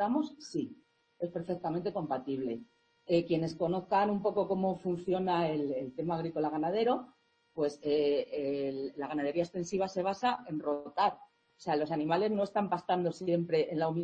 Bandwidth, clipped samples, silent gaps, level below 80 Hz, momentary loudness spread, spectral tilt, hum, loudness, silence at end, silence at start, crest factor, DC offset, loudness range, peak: 8.8 kHz; under 0.1%; none; -70 dBFS; 8 LU; -6.5 dB/octave; none; -33 LUFS; 0 s; 0 s; 18 dB; under 0.1%; 2 LU; -16 dBFS